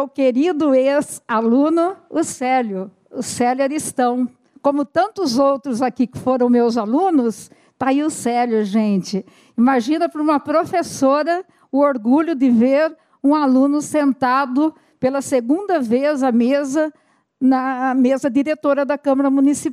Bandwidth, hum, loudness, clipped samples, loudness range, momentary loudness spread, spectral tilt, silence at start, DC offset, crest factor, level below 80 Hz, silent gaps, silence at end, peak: 13.5 kHz; none; -18 LUFS; under 0.1%; 3 LU; 7 LU; -5 dB/octave; 0 s; under 0.1%; 14 dB; -64 dBFS; none; 0 s; -2 dBFS